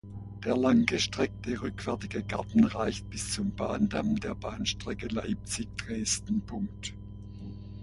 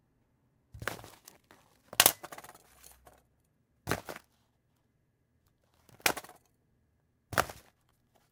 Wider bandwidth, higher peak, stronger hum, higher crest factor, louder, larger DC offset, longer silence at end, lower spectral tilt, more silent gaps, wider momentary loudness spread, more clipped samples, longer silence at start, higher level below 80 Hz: second, 11.5 kHz vs 18 kHz; second, -8 dBFS vs 0 dBFS; first, 60 Hz at -45 dBFS vs none; second, 22 dB vs 38 dB; about the same, -31 LUFS vs -31 LUFS; neither; second, 0 s vs 0.7 s; first, -4.5 dB/octave vs -1 dB/octave; neither; second, 15 LU vs 24 LU; neither; second, 0.05 s vs 0.75 s; first, -48 dBFS vs -64 dBFS